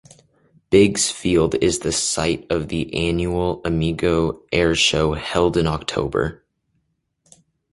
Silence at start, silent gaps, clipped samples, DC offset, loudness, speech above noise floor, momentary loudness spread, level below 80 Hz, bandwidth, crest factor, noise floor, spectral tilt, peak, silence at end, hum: 0.7 s; none; under 0.1%; under 0.1%; -20 LUFS; 51 dB; 7 LU; -38 dBFS; 11.5 kHz; 18 dB; -70 dBFS; -4 dB/octave; -2 dBFS; 1.4 s; none